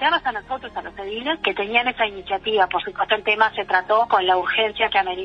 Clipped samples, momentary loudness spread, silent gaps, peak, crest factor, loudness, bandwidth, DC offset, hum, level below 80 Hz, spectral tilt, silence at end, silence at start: under 0.1%; 11 LU; none; -2 dBFS; 18 dB; -20 LUFS; 6.6 kHz; under 0.1%; none; -52 dBFS; -4.5 dB/octave; 0 s; 0 s